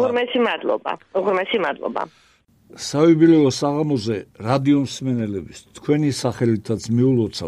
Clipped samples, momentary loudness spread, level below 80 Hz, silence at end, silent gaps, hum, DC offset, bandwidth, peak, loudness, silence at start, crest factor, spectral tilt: under 0.1%; 12 LU; -56 dBFS; 0 s; none; none; under 0.1%; 12.5 kHz; -4 dBFS; -20 LUFS; 0 s; 16 dB; -6 dB/octave